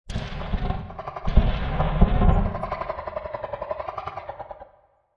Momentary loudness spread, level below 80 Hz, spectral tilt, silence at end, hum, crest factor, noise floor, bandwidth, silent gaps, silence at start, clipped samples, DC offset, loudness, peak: 14 LU; -26 dBFS; -8.5 dB/octave; 0.55 s; none; 22 dB; -58 dBFS; 6.6 kHz; none; 0.05 s; under 0.1%; under 0.1%; -27 LUFS; -2 dBFS